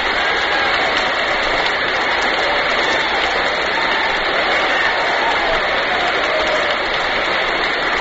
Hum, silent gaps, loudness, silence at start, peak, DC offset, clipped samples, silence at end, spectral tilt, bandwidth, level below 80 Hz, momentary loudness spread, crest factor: none; none; -16 LUFS; 0 s; -2 dBFS; under 0.1%; under 0.1%; 0 s; 1 dB/octave; 8 kHz; -40 dBFS; 2 LU; 14 dB